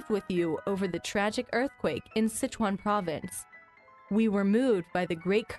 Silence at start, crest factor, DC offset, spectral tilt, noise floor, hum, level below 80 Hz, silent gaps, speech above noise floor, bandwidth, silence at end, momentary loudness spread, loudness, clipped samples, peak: 0 s; 16 dB; under 0.1%; -5.5 dB/octave; -56 dBFS; none; -60 dBFS; none; 27 dB; 12 kHz; 0 s; 8 LU; -30 LUFS; under 0.1%; -14 dBFS